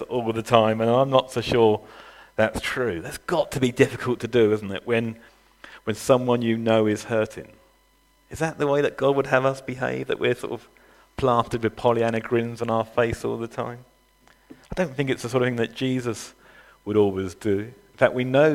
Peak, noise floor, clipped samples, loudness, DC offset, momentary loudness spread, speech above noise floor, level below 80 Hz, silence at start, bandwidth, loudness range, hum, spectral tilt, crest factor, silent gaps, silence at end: 0 dBFS; -61 dBFS; under 0.1%; -23 LUFS; under 0.1%; 13 LU; 38 dB; -52 dBFS; 0 s; 16 kHz; 4 LU; none; -6 dB/octave; 24 dB; none; 0 s